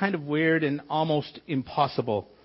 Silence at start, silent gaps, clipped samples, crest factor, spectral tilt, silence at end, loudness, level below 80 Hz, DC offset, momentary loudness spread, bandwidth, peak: 0 s; none; under 0.1%; 18 dB; -10.5 dB/octave; 0.2 s; -27 LUFS; -64 dBFS; under 0.1%; 7 LU; 5.8 kHz; -8 dBFS